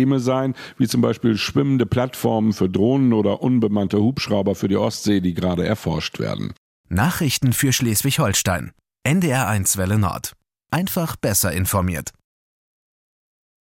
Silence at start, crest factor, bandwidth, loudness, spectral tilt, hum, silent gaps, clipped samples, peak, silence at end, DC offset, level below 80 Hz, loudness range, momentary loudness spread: 0 s; 16 dB; 17 kHz; -20 LUFS; -5 dB/octave; none; 6.58-6.84 s; under 0.1%; -4 dBFS; 1.55 s; under 0.1%; -48 dBFS; 3 LU; 8 LU